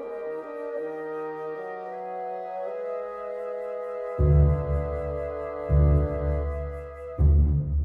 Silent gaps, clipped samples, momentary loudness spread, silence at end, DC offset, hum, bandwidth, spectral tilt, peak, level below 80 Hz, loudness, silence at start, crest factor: none; under 0.1%; 13 LU; 0 s; under 0.1%; none; 2.8 kHz; -11.5 dB/octave; -10 dBFS; -30 dBFS; -28 LUFS; 0 s; 16 dB